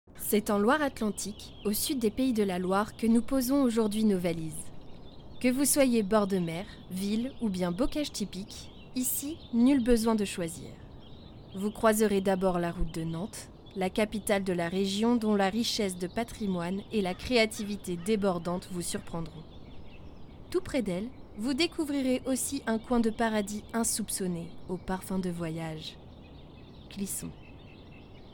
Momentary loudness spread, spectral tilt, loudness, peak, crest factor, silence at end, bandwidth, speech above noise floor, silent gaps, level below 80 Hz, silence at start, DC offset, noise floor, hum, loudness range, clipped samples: 21 LU; -4.5 dB/octave; -30 LUFS; -12 dBFS; 18 dB; 0 s; 19 kHz; 20 dB; none; -50 dBFS; 0.1 s; under 0.1%; -49 dBFS; none; 6 LU; under 0.1%